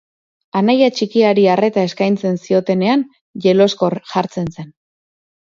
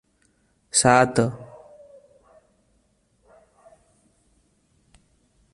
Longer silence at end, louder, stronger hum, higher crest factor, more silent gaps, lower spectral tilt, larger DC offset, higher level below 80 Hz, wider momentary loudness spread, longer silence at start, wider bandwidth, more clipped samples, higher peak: second, 0.9 s vs 4.1 s; first, -16 LUFS vs -19 LUFS; neither; second, 16 dB vs 24 dB; first, 3.21-3.34 s vs none; first, -6.5 dB/octave vs -3.5 dB/octave; neither; about the same, -58 dBFS vs -58 dBFS; second, 10 LU vs 25 LU; second, 0.55 s vs 0.75 s; second, 7.6 kHz vs 11.5 kHz; neither; about the same, 0 dBFS vs -2 dBFS